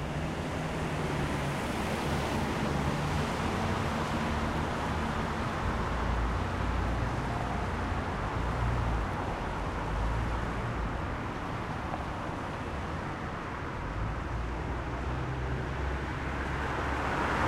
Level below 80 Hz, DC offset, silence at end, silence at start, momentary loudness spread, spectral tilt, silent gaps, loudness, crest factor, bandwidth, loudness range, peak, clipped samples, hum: -38 dBFS; under 0.1%; 0 s; 0 s; 5 LU; -6 dB/octave; none; -33 LUFS; 14 dB; 15.5 kHz; 4 LU; -18 dBFS; under 0.1%; none